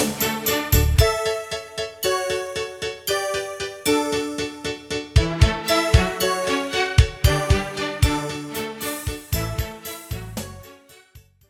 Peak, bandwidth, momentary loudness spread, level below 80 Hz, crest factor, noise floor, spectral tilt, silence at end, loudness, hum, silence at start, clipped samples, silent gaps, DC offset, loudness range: -2 dBFS; 17 kHz; 12 LU; -28 dBFS; 20 dB; -50 dBFS; -4.5 dB/octave; 0.3 s; -22 LUFS; none; 0 s; under 0.1%; none; under 0.1%; 6 LU